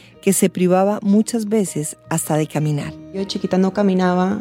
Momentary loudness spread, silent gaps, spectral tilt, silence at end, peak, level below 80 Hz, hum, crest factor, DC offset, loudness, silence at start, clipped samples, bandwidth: 9 LU; none; -5.5 dB/octave; 0 s; -4 dBFS; -56 dBFS; none; 14 dB; under 0.1%; -19 LUFS; 0.25 s; under 0.1%; 16.5 kHz